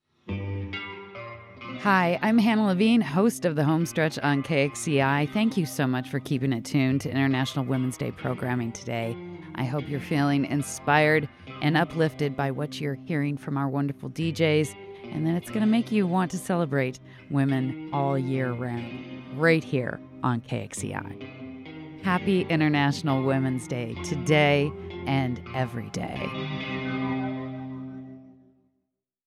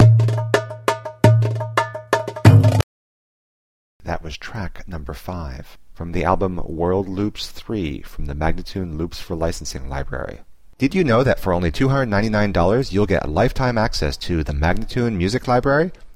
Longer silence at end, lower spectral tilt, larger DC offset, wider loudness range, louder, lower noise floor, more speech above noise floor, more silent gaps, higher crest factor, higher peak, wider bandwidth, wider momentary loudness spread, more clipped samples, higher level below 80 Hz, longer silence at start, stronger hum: first, 0.95 s vs 0.05 s; about the same, -6 dB/octave vs -7 dB/octave; second, under 0.1% vs 0.7%; second, 5 LU vs 9 LU; second, -26 LUFS vs -20 LUFS; second, -80 dBFS vs under -90 dBFS; second, 55 dB vs over 70 dB; second, none vs 2.83-4.00 s; about the same, 18 dB vs 20 dB; second, -8 dBFS vs 0 dBFS; about the same, 14.5 kHz vs 14.5 kHz; about the same, 15 LU vs 15 LU; neither; second, -60 dBFS vs -32 dBFS; first, 0.25 s vs 0 s; neither